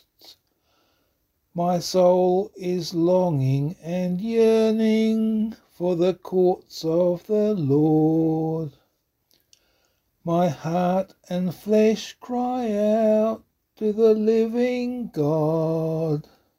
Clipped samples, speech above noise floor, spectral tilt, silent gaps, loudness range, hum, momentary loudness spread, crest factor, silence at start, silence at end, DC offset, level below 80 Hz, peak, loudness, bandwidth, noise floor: under 0.1%; 49 dB; -7.5 dB/octave; none; 3 LU; none; 9 LU; 16 dB; 0.3 s; 0.35 s; under 0.1%; -62 dBFS; -6 dBFS; -22 LUFS; 16 kHz; -71 dBFS